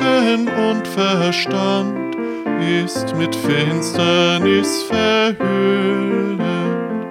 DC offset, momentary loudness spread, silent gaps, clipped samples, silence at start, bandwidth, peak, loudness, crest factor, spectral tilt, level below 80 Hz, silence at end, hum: under 0.1%; 7 LU; none; under 0.1%; 0 s; 16 kHz; -2 dBFS; -17 LUFS; 14 dB; -5 dB/octave; -58 dBFS; 0 s; none